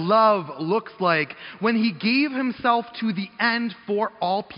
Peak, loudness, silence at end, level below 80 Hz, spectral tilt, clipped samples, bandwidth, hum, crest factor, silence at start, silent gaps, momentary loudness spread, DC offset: -6 dBFS; -23 LUFS; 0 s; -68 dBFS; -3 dB/octave; under 0.1%; 5.4 kHz; none; 16 dB; 0 s; none; 7 LU; under 0.1%